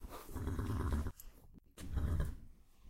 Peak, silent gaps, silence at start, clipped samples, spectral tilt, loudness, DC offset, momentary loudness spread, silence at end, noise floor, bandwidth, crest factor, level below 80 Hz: -24 dBFS; none; 0 s; under 0.1%; -7 dB/octave; -42 LUFS; under 0.1%; 19 LU; 0 s; -60 dBFS; 16 kHz; 18 dB; -44 dBFS